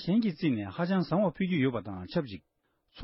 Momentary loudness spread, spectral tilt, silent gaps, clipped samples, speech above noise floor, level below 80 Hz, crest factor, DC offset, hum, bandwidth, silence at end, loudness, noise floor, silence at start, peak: 9 LU; -11 dB/octave; none; under 0.1%; 23 dB; -62 dBFS; 14 dB; under 0.1%; none; 5.8 kHz; 0 s; -30 LUFS; -52 dBFS; 0 s; -16 dBFS